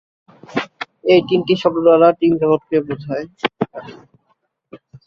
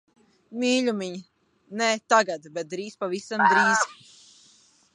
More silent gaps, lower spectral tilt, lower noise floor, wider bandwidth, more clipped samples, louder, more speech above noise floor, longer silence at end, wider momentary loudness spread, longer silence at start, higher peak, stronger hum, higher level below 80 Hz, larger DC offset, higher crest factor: neither; first, -7.5 dB/octave vs -3 dB/octave; first, -65 dBFS vs -59 dBFS; second, 6.8 kHz vs 11 kHz; neither; first, -17 LUFS vs -24 LUFS; first, 51 dB vs 35 dB; second, 0.1 s vs 1 s; about the same, 14 LU vs 16 LU; about the same, 0.5 s vs 0.5 s; first, -2 dBFS vs -6 dBFS; neither; first, -58 dBFS vs -80 dBFS; neither; about the same, 16 dB vs 20 dB